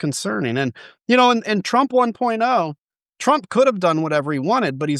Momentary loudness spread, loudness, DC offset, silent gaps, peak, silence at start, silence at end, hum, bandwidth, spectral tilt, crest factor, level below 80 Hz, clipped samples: 8 LU; -19 LUFS; under 0.1%; 2.78-2.88 s, 3.02-3.06 s; -2 dBFS; 0 s; 0 s; none; 12.5 kHz; -5 dB/octave; 16 dB; -70 dBFS; under 0.1%